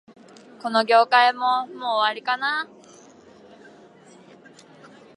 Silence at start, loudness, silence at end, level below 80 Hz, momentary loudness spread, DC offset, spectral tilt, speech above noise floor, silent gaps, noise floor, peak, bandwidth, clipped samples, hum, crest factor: 0.65 s; -20 LUFS; 2.5 s; -80 dBFS; 11 LU; under 0.1%; -3 dB/octave; 29 dB; none; -49 dBFS; -4 dBFS; 11 kHz; under 0.1%; none; 20 dB